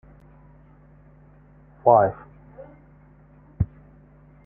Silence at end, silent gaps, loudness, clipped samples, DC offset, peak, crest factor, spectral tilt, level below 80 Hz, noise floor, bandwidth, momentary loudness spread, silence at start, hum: 0.8 s; none; -21 LUFS; under 0.1%; under 0.1%; -4 dBFS; 24 dB; -13 dB/octave; -48 dBFS; -52 dBFS; 2.7 kHz; 29 LU; 1.85 s; none